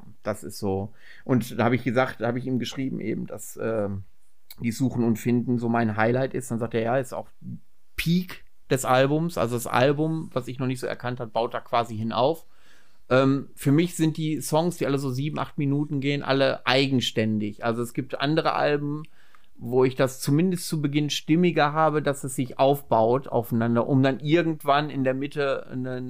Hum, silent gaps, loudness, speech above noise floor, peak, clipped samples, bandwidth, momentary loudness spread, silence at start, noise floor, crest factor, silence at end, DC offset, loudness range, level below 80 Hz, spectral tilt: none; none; -25 LUFS; 35 dB; -2 dBFS; under 0.1%; 16 kHz; 11 LU; 0.1 s; -59 dBFS; 22 dB; 0 s; 0.9%; 4 LU; -56 dBFS; -6 dB/octave